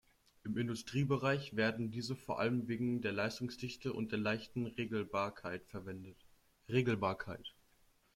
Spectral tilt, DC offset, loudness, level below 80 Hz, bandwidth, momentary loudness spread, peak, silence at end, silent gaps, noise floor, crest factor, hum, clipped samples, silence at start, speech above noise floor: -6.5 dB/octave; under 0.1%; -38 LUFS; -68 dBFS; 15.5 kHz; 13 LU; -20 dBFS; 0.65 s; none; -71 dBFS; 20 dB; none; under 0.1%; 0.45 s; 33 dB